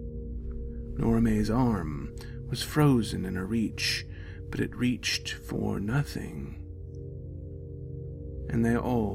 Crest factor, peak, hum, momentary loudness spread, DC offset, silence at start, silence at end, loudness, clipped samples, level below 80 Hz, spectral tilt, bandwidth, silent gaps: 20 dB; -10 dBFS; none; 16 LU; under 0.1%; 0 s; 0 s; -30 LUFS; under 0.1%; -40 dBFS; -5.5 dB/octave; 16 kHz; none